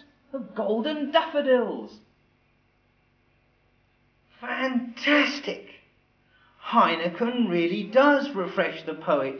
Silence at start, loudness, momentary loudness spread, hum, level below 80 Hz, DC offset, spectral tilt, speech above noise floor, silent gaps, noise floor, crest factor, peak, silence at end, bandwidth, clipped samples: 0.35 s; -24 LUFS; 17 LU; none; -72 dBFS; under 0.1%; -5.5 dB/octave; 41 dB; none; -66 dBFS; 20 dB; -6 dBFS; 0 s; 5.4 kHz; under 0.1%